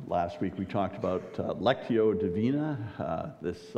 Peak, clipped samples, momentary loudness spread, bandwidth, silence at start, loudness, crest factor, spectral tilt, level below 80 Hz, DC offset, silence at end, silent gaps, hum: -12 dBFS; under 0.1%; 8 LU; 8.8 kHz; 0 s; -31 LUFS; 18 dB; -8 dB/octave; -60 dBFS; under 0.1%; 0 s; none; none